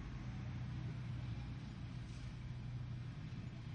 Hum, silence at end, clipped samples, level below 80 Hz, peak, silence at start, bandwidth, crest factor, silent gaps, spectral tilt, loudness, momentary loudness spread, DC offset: none; 0 s; under 0.1%; -56 dBFS; -36 dBFS; 0 s; 8.8 kHz; 10 dB; none; -7 dB/octave; -48 LUFS; 3 LU; under 0.1%